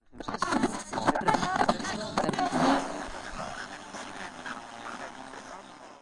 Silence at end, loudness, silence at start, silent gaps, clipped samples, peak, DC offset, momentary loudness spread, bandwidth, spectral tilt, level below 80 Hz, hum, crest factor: 0 s; -31 LUFS; 0.1 s; none; under 0.1%; -10 dBFS; under 0.1%; 16 LU; 11.5 kHz; -4 dB/octave; -54 dBFS; none; 22 dB